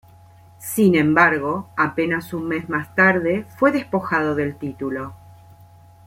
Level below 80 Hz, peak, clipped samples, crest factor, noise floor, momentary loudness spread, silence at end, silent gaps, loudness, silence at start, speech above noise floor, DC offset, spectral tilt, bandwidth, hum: -58 dBFS; -2 dBFS; under 0.1%; 18 dB; -48 dBFS; 12 LU; 0.9 s; none; -20 LUFS; 0.6 s; 28 dB; under 0.1%; -6 dB/octave; 16.5 kHz; none